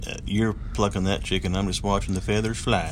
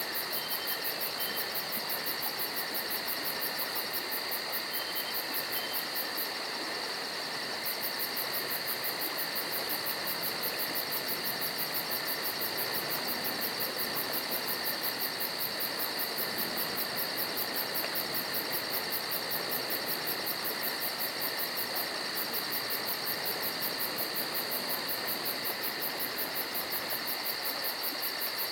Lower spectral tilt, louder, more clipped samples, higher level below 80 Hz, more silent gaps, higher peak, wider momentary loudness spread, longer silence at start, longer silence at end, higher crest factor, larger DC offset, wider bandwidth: first, -5 dB/octave vs -1 dB/octave; first, -25 LUFS vs -31 LUFS; neither; first, -34 dBFS vs -72 dBFS; neither; first, -8 dBFS vs -16 dBFS; about the same, 2 LU vs 1 LU; about the same, 0 s vs 0 s; about the same, 0 s vs 0 s; about the same, 16 dB vs 18 dB; neither; second, 13.5 kHz vs 19.5 kHz